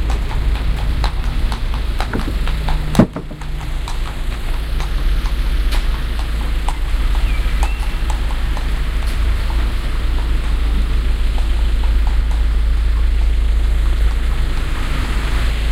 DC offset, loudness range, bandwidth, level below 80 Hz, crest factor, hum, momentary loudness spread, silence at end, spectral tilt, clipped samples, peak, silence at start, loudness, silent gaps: under 0.1%; 3 LU; 13 kHz; -16 dBFS; 16 dB; none; 5 LU; 0 s; -6 dB/octave; under 0.1%; 0 dBFS; 0 s; -20 LUFS; none